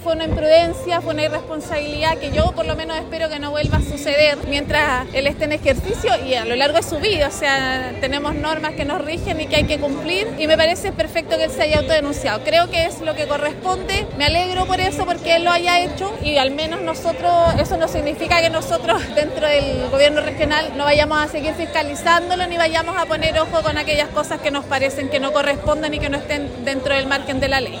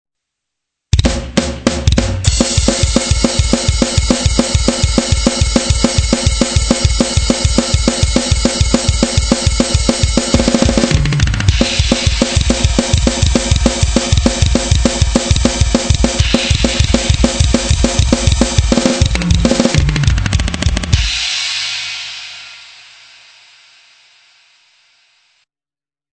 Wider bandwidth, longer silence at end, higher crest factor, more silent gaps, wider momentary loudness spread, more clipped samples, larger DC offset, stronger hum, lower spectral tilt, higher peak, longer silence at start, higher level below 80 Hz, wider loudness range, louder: first, 16.5 kHz vs 9.6 kHz; second, 0 s vs 3.45 s; about the same, 18 dB vs 14 dB; neither; first, 7 LU vs 3 LU; second, under 0.1% vs 0.3%; neither; neither; about the same, -4.5 dB/octave vs -4.5 dB/octave; about the same, 0 dBFS vs 0 dBFS; second, 0 s vs 0.95 s; second, -34 dBFS vs -18 dBFS; about the same, 2 LU vs 4 LU; second, -18 LUFS vs -13 LUFS